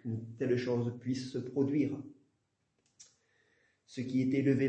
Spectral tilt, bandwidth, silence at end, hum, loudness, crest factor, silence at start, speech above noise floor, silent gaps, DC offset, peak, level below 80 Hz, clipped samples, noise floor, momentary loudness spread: -7.5 dB/octave; 8.6 kHz; 0 s; none; -34 LUFS; 18 dB; 0.05 s; 47 dB; none; under 0.1%; -18 dBFS; -76 dBFS; under 0.1%; -79 dBFS; 13 LU